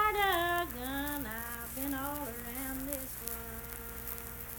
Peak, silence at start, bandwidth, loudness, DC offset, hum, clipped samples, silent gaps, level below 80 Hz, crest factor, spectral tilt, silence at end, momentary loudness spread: -10 dBFS; 0 s; 19 kHz; -36 LUFS; under 0.1%; none; under 0.1%; none; -50 dBFS; 26 dB; -3 dB/octave; 0 s; 11 LU